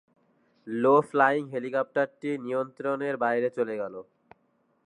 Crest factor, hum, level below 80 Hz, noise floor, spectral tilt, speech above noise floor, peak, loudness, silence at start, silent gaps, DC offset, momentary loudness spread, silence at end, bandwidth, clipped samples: 20 dB; none; -82 dBFS; -70 dBFS; -7 dB/octave; 43 dB; -8 dBFS; -27 LUFS; 0.65 s; none; under 0.1%; 12 LU; 0.85 s; 10.5 kHz; under 0.1%